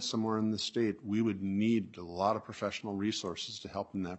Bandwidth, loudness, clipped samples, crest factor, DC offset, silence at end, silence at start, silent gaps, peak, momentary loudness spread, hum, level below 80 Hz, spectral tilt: 8.2 kHz; -34 LUFS; under 0.1%; 18 dB; under 0.1%; 0 s; 0 s; none; -16 dBFS; 8 LU; none; -72 dBFS; -5 dB/octave